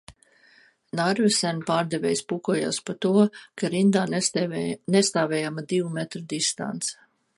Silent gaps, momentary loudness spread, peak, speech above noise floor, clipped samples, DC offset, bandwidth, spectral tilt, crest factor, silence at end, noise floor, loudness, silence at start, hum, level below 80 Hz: none; 9 LU; -6 dBFS; 34 dB; under 0.1%; under 0.1%; 11.5 kHz; -4.5 dB/octave; 18 dB; 0.45 s; -58 dBFS; -25 LUFS; 0.1 s; none; -68 dBFS